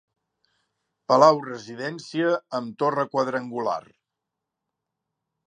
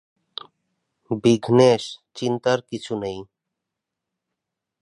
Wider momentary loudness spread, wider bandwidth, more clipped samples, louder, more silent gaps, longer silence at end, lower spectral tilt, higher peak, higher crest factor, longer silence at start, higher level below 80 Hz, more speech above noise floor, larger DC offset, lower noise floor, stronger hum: second, 16 LU vs 21 LU; second, 9.8 kHz vs 11 kHz; neither; about the same, -23 LUFS vs -21 LUFS; neither; about the same, 1.7 s vs 1.6 s; about the same, -5.5 dB/octave vs -6 dB/octave; about the same, -2 dBFS vs -2 dBFS; about the same, 24 dB vs 20 dB; about the same, 1.1 s vs 1.1 s; second, -80 dBFS vs -62 dBFS; about the same, 61 dB vs 64 dB; neither; about the same, -84 dBFS vs -84 dBFS; neither